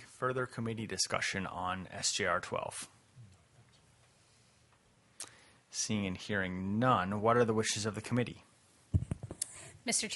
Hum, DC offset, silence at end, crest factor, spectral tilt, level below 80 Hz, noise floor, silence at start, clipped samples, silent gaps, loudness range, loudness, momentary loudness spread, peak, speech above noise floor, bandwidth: none; under 0.1%; 0 s; 22 dB; -4 dB/octave; -58 dBFS; -67 dBFS; 0 s; under 0.1%; none; 10 LU; -34 LUFS; 13 LU; -14 dBFS; 33 dB; 11.5 kHz